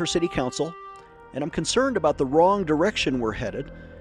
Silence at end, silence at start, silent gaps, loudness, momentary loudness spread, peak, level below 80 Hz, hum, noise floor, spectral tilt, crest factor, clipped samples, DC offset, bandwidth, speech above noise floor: 0 s; 0 s; none; -24 LUFS; 17 LU; -6 dBFS; -46 dBFS; none; -44 dBFS; -4.5 dB/octave; 18 dB; under 0.1%; under 0.1%; 11.5 kHz; 21 dB